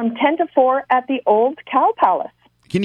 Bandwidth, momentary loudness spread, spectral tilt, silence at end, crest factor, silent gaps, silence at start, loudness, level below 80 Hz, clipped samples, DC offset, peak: 10 kHz; 6 LU; -7 dB/octave; 0 s; 16 dB; none; 0 s; -17 LUFS; -62 dBFS; under 0.1%; under 0.1%; -2 dBFS